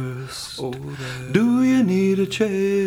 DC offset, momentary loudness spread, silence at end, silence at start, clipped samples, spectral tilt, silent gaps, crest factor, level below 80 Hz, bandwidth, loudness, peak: under 0.1%; 13 LU; 0 s; 0 s; under 0.1%; -6 dB/octave; none; 18 dB; -54 dBFS; 16.5 kHz; -21 LUFS; -2 dBFS